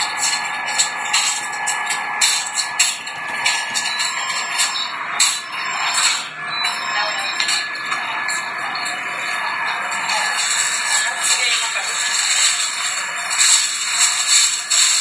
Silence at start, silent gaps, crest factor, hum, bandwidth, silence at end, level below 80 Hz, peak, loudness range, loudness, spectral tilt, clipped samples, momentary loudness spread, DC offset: 0 s; none; 20 dB; none; 11 kHz; 0 s; -78 dBFS; 0 dBFS; 5 LU; -17 LUFS; 2.5 dB/octave; under 0.1%; 9 LU; under 0.1%